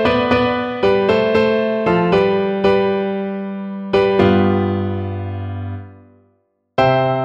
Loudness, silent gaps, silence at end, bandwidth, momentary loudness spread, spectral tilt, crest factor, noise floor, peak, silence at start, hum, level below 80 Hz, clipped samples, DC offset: -17 LUFS; none; 0 s; 7.4 kHz; 12 LU; -8 dB/octave; 16 dB; -63 dBFS; -2 dBFS; 0 s; none; -44 dBFS; under 0.1%; under 0.1%